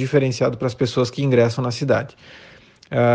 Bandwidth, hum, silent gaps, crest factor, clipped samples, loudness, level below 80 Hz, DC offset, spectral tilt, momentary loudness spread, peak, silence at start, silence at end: 9.2 kHz; none; none; 16 dB; under 0.1%; -20 LUFS; -56 dBFS; under 0.1%; -6.5 dB/octave; 6 LU; -4 dBFS; 0 s; 0 s